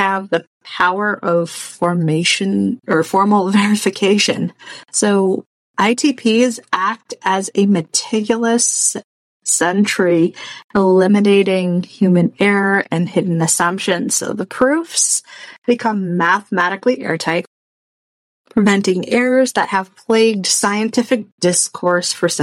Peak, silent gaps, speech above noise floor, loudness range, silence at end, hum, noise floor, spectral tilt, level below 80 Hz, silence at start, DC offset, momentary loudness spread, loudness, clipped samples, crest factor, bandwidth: -2 dBFS; 0.47-0.61 s, 5.46-5.74 s, 9.04-9.40 s, 10.64-10.70 s, 15.58-15.62 s, 17.47-18.45 s, 21.32-21.38 s; over 74 dB; 3 LU; 0 s; none; under -90 dBFS; -4 dB/octave; -62 dBFS; 0 s; under 0.1%; 7 LU; -16 LUFS; under 0.1%; 14 dB; 15.5 kHz